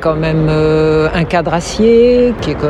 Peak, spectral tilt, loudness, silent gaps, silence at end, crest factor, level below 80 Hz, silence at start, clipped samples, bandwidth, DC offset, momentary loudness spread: 0 dBFS; -6.5 dB/octave; -11 LUFS; none; 0 s; 12 dB; -28 dBFS; 0 s; under 0.1%; 10.5 kHz; under 0.1%; 6 LU